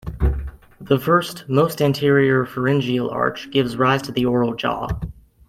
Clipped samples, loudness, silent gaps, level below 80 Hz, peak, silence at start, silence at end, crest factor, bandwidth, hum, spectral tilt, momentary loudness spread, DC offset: under 0.1%; -20 LUFS; none; -32 dBFS; -2 dBFS; 0.05 s; 0.35 s; 18 dB; 16 kHz; none; -6.5 dB/octave; 10 LU; under 0.1%